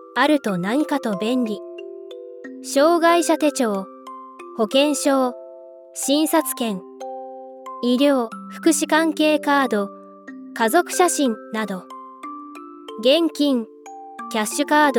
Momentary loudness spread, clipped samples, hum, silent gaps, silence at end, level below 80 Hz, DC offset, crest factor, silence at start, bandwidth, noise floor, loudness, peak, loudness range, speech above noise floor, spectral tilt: 20 LU; under 0.1%; none; none; 0 s; -78 dBFS; under 0.1%; 18 dB; 0 s; 18 kHz; -41 dBFS; -20 LUFS; -4 dBFS; 3 LU; 22 dB; -3.5 dB/octave